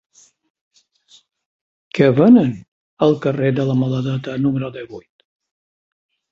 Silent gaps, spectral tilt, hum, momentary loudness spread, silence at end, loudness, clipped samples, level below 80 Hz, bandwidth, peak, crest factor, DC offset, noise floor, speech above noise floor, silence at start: 2.68-2.97 s; -8.5 dB/octave; none; 21 LU; 1.35 s; -17 LUFS; under 0.1%; -58 dBFS; 7.2 kHz; -2 dBFS; 18 dB; under 0.1%; -53 dBFS; 37 dB; 1.95 s